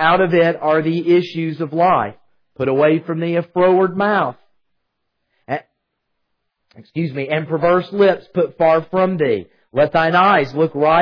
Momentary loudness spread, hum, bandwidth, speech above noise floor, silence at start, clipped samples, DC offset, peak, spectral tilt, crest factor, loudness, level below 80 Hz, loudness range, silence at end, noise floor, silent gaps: 10 LU; none; 5.4 kHz; 58 dB; 0 s; under 0.1%; under 0.1%; -2 dBFS; -8.5 dB/octave; 16 dB; -17 LUFS; -56 dBFS; 9 LU; 0 s; -74 dBFS; none